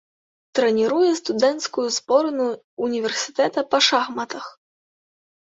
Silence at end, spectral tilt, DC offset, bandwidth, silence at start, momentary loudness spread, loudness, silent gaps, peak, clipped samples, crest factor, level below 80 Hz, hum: 1 s; -2.5 dB/octave; under 0.1%; 8 kHz; 0.55 s; 10 LU; -21 LUFS; 2.64-2.77 s; -2 dBFS; under 0.1%; 20 dB; -70 dBFS; none